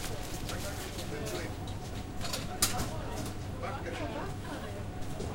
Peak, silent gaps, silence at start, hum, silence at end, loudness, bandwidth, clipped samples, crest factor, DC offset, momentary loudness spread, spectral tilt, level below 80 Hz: -10 dBFS; none; 0 s; none; 0 s; -37 LUFS; 16.5 kHz; under 0.1%; 26 dB; under 0.1%; 10 LU; -4 dB/octave; -46 dBFS